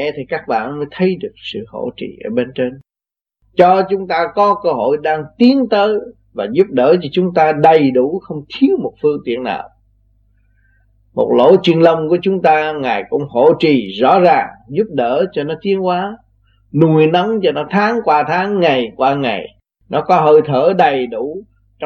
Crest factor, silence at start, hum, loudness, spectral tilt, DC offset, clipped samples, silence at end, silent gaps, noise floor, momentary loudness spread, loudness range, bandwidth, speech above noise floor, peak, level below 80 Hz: 14 dB; 0 s; 50 Hz at -50 dBFS; -14 LUFS; -8 dB/octave; under 0.1%; under 0.1%; 0 s; none; -88 dBFS; 13 LU; 5 LU; 6.8 kHz; 75 dB; 0 dBFS; -54 dBFS